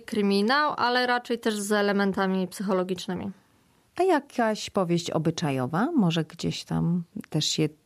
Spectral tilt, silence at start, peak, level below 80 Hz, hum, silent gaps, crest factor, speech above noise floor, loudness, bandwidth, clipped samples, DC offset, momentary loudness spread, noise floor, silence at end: -5 dB/octave; 0 s; -12 dBFS; -62 dBFS; none; none; 14 dB; 37 dB; -26 LUFS; 14.5 kHz; under 0.1%; under 0.1%; 8 LU; -63 dBFS; 0.15 s